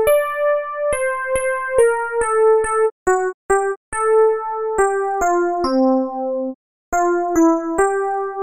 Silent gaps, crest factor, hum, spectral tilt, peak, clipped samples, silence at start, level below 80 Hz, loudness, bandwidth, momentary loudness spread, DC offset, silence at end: 2.92-3.06 s, 3.34-3.49 s, 3.77-3.92 s, 6.55-6.92 s; 14 dB; none; -4 dB/octave; -2 dBFS; under 0.1%; 0 s; -44 dBFS; -18 LUFS; 15.5 kHz; 7 LU; under 0.1%; 0 s